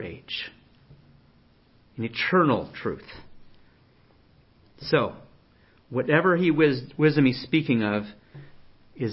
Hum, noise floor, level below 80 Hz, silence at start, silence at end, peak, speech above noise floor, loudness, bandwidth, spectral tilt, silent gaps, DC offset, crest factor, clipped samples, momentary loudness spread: none; -59 dBFS; -60 dBFS; 0 s; 0 s; -6 dBFS; 35 dB; -24 LUFS; 5.8 kHz; -10.5 dB/octave; none; under 0.1%; 20 dB; under 0.1%; 18 LU